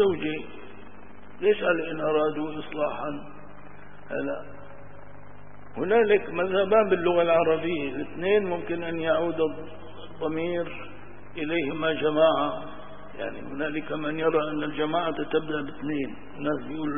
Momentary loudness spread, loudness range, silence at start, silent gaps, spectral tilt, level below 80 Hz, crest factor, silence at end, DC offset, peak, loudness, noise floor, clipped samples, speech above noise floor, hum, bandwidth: 22 LU; 6 LU; 0 s; none; -10 dB/octave; -56 dBFS; 18 dB; 0 s; 1%; -8 dBFS; -26 LUFS; -48 dBFS; under 0.1%; 22 dB; none; 3.7 kHz